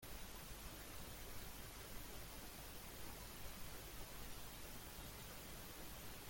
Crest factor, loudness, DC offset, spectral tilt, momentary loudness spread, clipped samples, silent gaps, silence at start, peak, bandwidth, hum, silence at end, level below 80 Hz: 14 dB; -53 LUFS; under 0.1%; -3 dB/octave; 0 LU; under 0.1%; none; 0 s; -38 dBFS; 17 kHz; none; 0 s; -60 dBFS